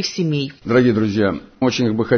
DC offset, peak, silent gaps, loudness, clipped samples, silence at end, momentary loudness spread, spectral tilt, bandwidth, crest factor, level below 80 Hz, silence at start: under 0.1%; -2 dBFS; none; -18 LUFS; under 0.1%; 0 s; 6 LU; -6 dB/octave; 6.6 kHz; 14 dB; -50 dBFS; 0 s